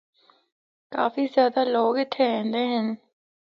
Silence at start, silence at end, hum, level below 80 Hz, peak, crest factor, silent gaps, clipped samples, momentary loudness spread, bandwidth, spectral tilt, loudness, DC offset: 0.9 s; 0.55 s; none; -78 dBFS; -8 dBFS; 18 dB; none; under 0.1%; 9 LU; 5.8 kHz; -7 dB/octave; -24 LUFS; under 0.1%